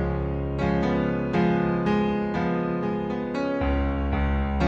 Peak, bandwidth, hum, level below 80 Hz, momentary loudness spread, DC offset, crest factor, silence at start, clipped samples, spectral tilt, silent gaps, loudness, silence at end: -10 dBFS; 7.6 kHz; none; -32 dBFS; 4 LU; under 0.1%; 14 dB; 0 s; under 0.1%; -8.5 dB/octave; none; -25 LUFS; 0 s